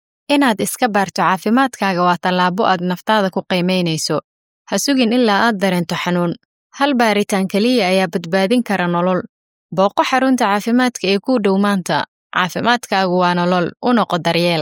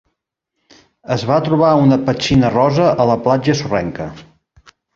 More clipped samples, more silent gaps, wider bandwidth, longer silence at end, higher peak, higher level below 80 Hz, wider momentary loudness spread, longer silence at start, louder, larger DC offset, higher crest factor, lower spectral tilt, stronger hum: neither; first, 4.24-4.65 s, 6.45-6.70 s, 9.29-9.69 s, 12.08-12.30 s vs none; first, 17 kHz vs 7.6 kHz; second, 0 s vs 0.75 s; about the same, -2 dBFS vs -2 dBFS; second, -64 dBFS vs -44 dBFS; second, 5 LU vs 10 LU; second, 0.3 s vs 1.1 s; about the same, -16 LUFS vs -15 LUFS; neither; about the same, 14 dB vs 14 dB; second, -5 dB/octave vs -6.5 dB/octave; neither